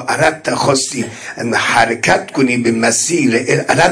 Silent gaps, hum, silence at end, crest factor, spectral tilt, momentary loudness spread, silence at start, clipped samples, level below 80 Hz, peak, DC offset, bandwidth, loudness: none; none; 0 s; 14 dB; -3.5 dB/octave; 6 LU; 0 s; under 0.1%; -48 dBFS; 0 dBFS; under 0.1%; 10.5 kHz; -14 LUFS